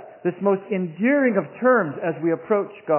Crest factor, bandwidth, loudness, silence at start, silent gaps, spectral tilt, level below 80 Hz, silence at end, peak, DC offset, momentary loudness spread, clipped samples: 16 dB; 3.2 kHz; -22 LUFS; 0 s; none; -11.5 dB/octave; -78 dBFS; 0 s; -6 dBFS; under 0.1%; 6 LU; under 0.1%